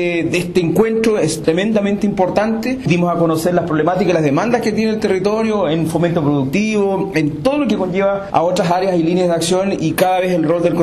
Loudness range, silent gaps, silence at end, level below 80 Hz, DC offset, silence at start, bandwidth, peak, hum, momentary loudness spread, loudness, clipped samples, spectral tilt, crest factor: 1 LU; none; 0 s; -46 dBFS; under 0.1%; 0 s; 13.5 kHz; -2 dBFS; none; 2 LU; -16 LUFS; under 0.1%; -6 dB/octave; 14 dB